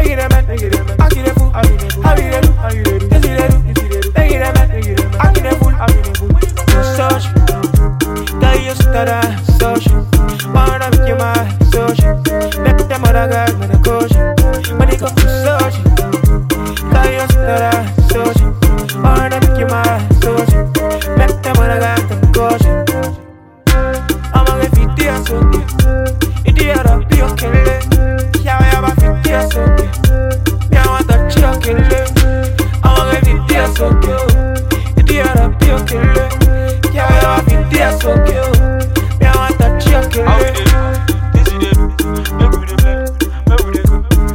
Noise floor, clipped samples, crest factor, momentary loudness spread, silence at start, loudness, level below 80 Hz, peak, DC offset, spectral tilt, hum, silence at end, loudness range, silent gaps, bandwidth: -36 dBFS; under 0.1%; 10 dB; 4 LU; 0 s; -12 LUFS; -12 dBFS; 0 dBFS; under 0.1%; -6 dB/octave; none; 0 s; 1 LU; none; 17 kHz